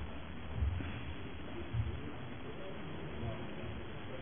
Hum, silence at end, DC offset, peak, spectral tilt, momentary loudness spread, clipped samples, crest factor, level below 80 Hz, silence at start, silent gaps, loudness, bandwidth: none; 0 s; 0.5%; -24 dBFS; -6 dB/octave; 7 LU; under 0.1%; 18 dB; -48 dBFS; 0 s; none; -43 LUFS; 3.6 kHz